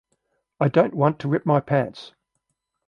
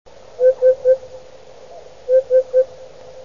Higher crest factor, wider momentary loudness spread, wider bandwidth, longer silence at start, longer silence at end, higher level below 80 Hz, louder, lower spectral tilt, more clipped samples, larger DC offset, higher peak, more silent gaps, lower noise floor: first, 20 dB vs 14 dB; about the same, 8 LU vs 7 LU; about the same, 7 kHz vs 7 kHz; first, 0.6 s vs 0.4 s; first, 0.8 s vs 0.05 s; second, -64 dBFS vs -58 dBFS; second, -22 LUFS vs -16 LUFS; first, -9 dB/octave vs -4.5 dB/octave; neither; second, under 0.1% vs 0.7%; about the same, -4 dBFS vs -6 dBFS; neither; first, -77 dBFS vs -42 dBFS